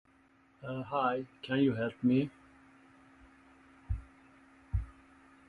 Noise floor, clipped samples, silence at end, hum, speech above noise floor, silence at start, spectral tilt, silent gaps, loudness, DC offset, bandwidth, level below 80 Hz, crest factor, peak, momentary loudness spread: -66 dBFS; under 0.1%; 0.55 s; none; 34 dB; 0.6 s; -8.5 dB/octave; none; -34 LUFS; under 0.1%; 4.8 kHz; -48 dBFS; 20 dB; -16 dBFS; 12 LU